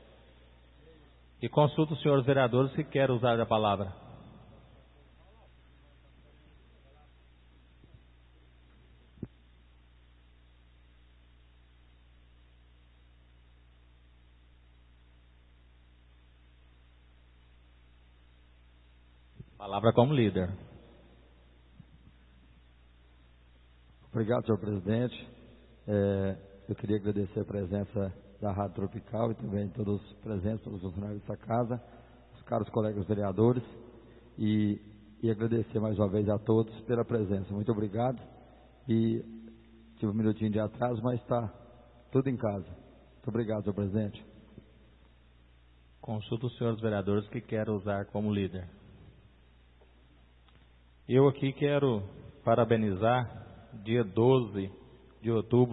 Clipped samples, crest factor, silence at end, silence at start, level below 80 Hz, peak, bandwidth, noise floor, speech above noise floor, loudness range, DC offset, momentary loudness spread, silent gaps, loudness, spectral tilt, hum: under 0.1%; 24 dB; 0 s; 1.4 s; -60 dBFS; -8 dBFS; 4.1 kHz; -60 dBFS; 30 dB; 8 LU; under 0.1%; 19 LU; none; -31 LUFS; -11.5 dB/octave; 60 Hz at -60 dBFS